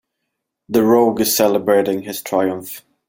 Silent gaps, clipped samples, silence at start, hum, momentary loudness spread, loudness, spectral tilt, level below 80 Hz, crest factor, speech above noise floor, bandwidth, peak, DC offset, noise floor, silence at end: none; under 0.1%; 0.7 s; none; 10 LU; -16 LUFS; -4 dB/octave; -58 dBFS; 16 dB; 61 dB; 17 kHz; -2 dBFS; under 0.1%; -77 dBFS; 0.3 s